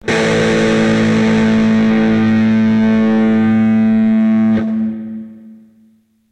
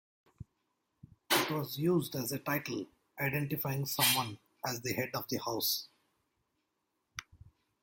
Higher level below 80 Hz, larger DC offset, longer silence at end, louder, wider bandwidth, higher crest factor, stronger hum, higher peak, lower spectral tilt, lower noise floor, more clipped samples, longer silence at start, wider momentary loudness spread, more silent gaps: first, -44 dBFS vs -70 dBFS; neither; first, 0.75 s vs 0.45 s; first, -12 LUFS vs -33 LUFS; second, 8.8 kHz vs 17 kHz; second, 12 dB vs 22 dB; neither; first, 0 dBFS vs -14 dBFS; first, -6.5 dB/octave vs -3.5 dB/octave; second, -52 dBFS vs -83 dBFS; neither; second, 0.05 s vs 0.4 s; second, 6 LU vs 18 LU; neither